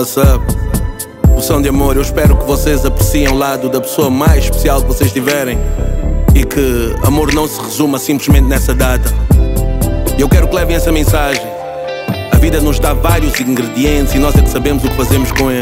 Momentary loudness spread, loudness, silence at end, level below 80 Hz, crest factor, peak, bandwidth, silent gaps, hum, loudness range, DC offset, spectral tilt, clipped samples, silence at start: 6 LU; -12 LUFS; 0 s; -14 dBFS; 10 dB; 0 dBFS; 16.5 kHz; none; none; 1 LU; under 0.1%; -5.5 dB/octave; under 0.1%; 0 s